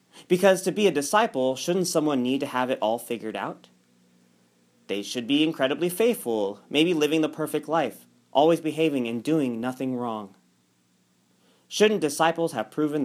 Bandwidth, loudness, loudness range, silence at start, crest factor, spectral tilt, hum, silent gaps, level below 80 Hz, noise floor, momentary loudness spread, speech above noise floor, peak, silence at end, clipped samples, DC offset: 16 kHz; -25 LUFS; 5 LU; 0.15 s; 20 dB; -4.5 dB/octave; none; none; -78 dBFS; -66 dBFS; 11 LU; 42 dB; -6 dBFS; 0 s; under 0.1%; under 0.1%